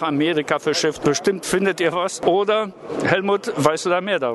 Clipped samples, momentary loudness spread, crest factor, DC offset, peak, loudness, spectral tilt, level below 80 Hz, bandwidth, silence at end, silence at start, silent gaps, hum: under 0.1%; 2 LU; 20 dB; under 0.1%; 0 dBFS; -20 LUFS; -4 dB/octave; -58 dBFS; 12.5 kHz; 0 s; 0 s; none; none